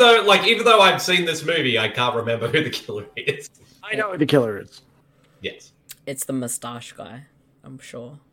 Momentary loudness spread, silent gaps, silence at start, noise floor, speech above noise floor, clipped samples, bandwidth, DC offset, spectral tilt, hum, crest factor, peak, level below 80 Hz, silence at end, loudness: 24 LU; none; 0 s; -57 dBFS; 37 dB; under 0.1%; 17 kHz; under 0.1%; -3.5 dB/octave; none; 18 dB; -2 dBFS; -64 dBFS; 0.15 s; -19 LUFS